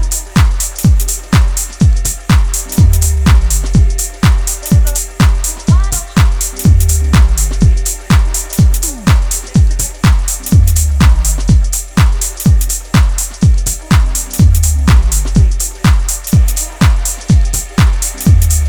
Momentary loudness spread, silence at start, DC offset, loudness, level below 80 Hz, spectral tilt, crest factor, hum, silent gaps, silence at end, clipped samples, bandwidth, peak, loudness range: 4 LU; 0 s; under 0.1%; -12 LUFS; -12 dBFS; -4.5 dB/octave; 10 dB; none; none; 0 s; under 0.1%; over 20 kHz; 0 dBFS; 1 LU